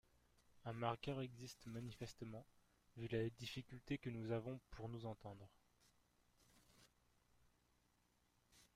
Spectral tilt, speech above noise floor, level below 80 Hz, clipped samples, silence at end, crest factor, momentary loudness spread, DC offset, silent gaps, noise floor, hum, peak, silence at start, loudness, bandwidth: -6.5 dB/octave; 32 dB; -72 dBFS; under 0.1%; 0.1 s; 24 dB; 12 LU; under 0.1%; none; -81 dBFS; 60 Hz at -75 dBFS; -28 dBFS; 0.55 s; -50 LUFS; 15.5 kHz